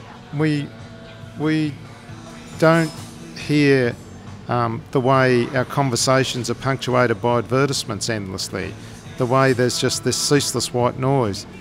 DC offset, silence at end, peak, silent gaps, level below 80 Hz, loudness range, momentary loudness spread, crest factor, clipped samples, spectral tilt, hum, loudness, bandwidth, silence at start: under 0.1%; 0 s; -2 dBFS; none; -50 dBFS; 3 LU; 20 LU; 18 dB; under 0.1%; -5 dB/octave; none; -20 LUFS; 16 kHz; 0 s